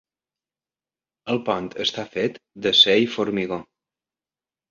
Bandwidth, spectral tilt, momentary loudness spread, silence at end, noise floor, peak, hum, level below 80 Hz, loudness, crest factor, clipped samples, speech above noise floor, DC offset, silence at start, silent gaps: 7.6 kHz; -4 dB/octave; 14 LU; 1.1 s; under -90 dBFS; -2 dBFS; none; -62 dBFS; -21 LUFS; 22 dB; under 0.1%; over 68 dB; under 0.1%; 1.25 s; none